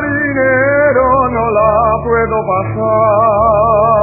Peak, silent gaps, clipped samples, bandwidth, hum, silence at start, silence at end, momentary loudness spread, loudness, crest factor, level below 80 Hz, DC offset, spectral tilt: 0 dBFS; none; under 0.1%; 2.7 kHz; none; 0 s; 0 s; 4 LU; -11 LUFS; 10 dB; -32 dBFS; under 0.1%; -15.5 dB/octave